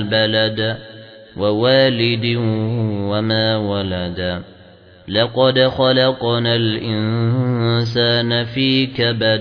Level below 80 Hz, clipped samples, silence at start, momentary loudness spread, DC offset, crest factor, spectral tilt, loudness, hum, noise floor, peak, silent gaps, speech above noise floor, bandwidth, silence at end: -50 dBFS; under 0.1%; 0 s; 8 LU; under 0.1%; 16 dB; -8 dB/octave; -17 LUFS; none; -44 dBFS; -2 dBFS; none; 27 dB; 5.4 kHz; 0 s